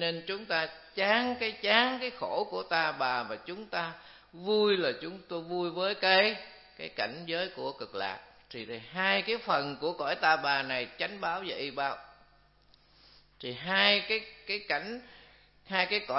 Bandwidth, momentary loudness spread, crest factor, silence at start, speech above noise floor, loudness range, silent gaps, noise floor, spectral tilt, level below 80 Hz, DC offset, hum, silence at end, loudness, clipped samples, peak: 6 kHz; 16 LU; 24 dB; 0 s; 32 dB; 3 LU; none; -63 dBFS; -7 dB/octave; -70 dBFS; under 0.1%; none; 0 s; -30 LUFS; under 0.1%; -8 dBFS